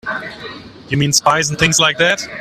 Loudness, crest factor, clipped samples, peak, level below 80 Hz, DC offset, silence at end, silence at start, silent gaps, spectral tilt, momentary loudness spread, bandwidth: -14 LUFS; 16 dB; under 0.1%; 0 dBFS; -44 dBFS; under 0.1%; 0 s; 0.05 s; none; -2.5 dB/octave; 19 LU; 16 kHz